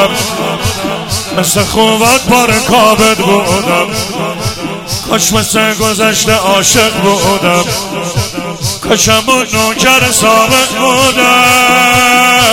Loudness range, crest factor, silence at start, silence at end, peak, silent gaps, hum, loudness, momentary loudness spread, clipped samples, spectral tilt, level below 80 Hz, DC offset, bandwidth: 4 LU; 10 dB; 0 s; 0 s; 0 dBFS; none; none; -8 LUFS; 10 LU; 0.9%; -2.5 dB/octave; -34 dBFS; under 0.1%; over 20 kHz